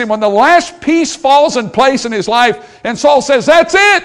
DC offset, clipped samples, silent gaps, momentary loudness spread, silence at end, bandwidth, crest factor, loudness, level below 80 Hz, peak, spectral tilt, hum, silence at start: 0.1%; 2%; none; 6 LU; 0 s; 12 kHz; 10 dB; -10 LUFS; -46 dBFS; 0 dBFS; -3 dB/octave; none; 0 s